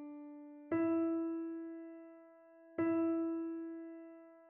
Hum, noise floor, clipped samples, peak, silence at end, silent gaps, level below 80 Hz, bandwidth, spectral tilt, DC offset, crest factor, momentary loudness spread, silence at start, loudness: none; -61 dBFS; under 0.1%; -24 dBFS; 0 s; none; -84 dBFS; 2.8 kHz; -8.5 dB/octave; under 0.1%; 16 dB; 19 LU; 0 s; -38 LUFS